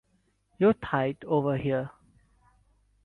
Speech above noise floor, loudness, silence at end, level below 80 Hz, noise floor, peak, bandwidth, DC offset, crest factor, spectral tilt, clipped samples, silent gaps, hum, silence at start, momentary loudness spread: 44 dB; -27 LUFS; 1.15 s; -58 dBFS; -70 dBFS; -12 dBFS; 4.3 kHz; under 0.1%; 18 dB; -9.5 dB/octave; under 0.1%; none; none; 0.6 s; 7 LU